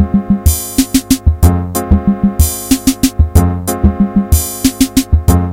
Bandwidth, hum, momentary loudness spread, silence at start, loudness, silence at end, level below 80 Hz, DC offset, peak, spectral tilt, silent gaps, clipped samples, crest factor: 17 kHz; none; 3 LU; 0 s; -12 LUFS; 0 s; -16 dBFS; under 0.1%; 0 dBFS; -5.5 dB/octave; none; 0.1%; 12 dB